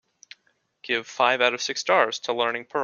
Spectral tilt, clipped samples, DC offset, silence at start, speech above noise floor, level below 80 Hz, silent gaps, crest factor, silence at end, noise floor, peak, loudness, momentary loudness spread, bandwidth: -1.5 dB/octave; under 0.1%; under 0.1%; 0.85 s; 45 dB; -76 dBFS; none; 22 dB; 0 s; -69 dBFS; -4 dBFS; -23 LUFS; 8 LU; 7.4 kHz